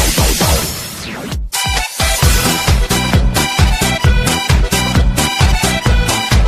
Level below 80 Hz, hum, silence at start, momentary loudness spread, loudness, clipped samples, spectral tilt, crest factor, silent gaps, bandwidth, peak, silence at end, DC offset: -18 dBFS; none; 0 s; 7 LU; -13 LUFS; under 0.1%; -3.5 dB/octave; 12 dB; none; 16 kHz; 0 dBFS; 0 s; under 0.1%